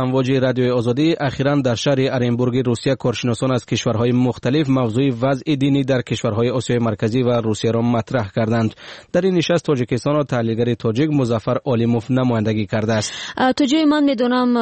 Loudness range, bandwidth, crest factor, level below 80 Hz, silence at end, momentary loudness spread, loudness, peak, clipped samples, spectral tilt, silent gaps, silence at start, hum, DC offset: 1 LU; 8.8 kHz; 12 dB; -50 dBFS; 0 s; 4 LU; -18 LUFS; -6 dBFS; under 0.1%; -6.5 dB/octave; none; 0 s; none; 0.1%